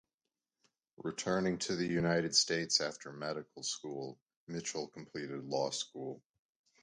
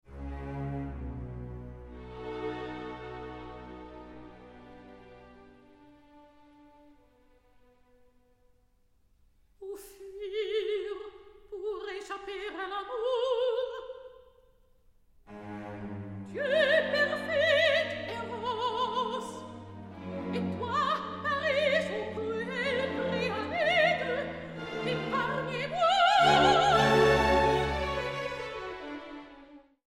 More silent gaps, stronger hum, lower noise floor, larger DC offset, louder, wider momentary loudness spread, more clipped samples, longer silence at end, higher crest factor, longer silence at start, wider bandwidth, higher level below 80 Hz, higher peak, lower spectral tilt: first, 4.22-4.26 s, 4.37-4.47 s vs none; neither; first, under -90 dBFS vs -67 dBFS; neither; second, -36 LUFS vs -29 LUFS; second, 15 LU vs 22 LU; neither; first, 0.65 s vs 0.3 s; about the same, 24 dB vs 20 dB; first, 1 s vs 0.1 s; second, 11 kHz vs 16 kHz; second, -70 dBFS vs -50 dBFS; second, -14 dBFS vs -10 dBFS; second, -3 dB/octave vs -4.5 dB/octave